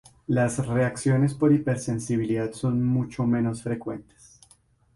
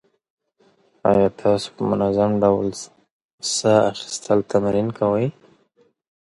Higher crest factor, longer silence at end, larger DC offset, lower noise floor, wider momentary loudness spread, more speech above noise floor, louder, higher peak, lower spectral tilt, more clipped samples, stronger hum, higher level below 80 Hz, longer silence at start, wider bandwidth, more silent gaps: about the same, 16 dB vs 18 dB; about the same, 0.95 s vs 1 s; neither; about the same, -60 dBFS vs -61 dBFS; about the same, 9 LU vs 10 LU; second, 36 dB vs 42 dB; second, -25 LUFS vs -20 LUFS; second, -10 dBFS vs -2 dBFS; first, -7.5 dB/octave vs -5.5 dB/octave; neither; neither; about the same, -54 dBFS vs -54 dBFS; second, 0.3 s vs 1.05 s; about the same, 11.5 kHz vs 11.5 kHz; second, none vs 3.11-3.38 s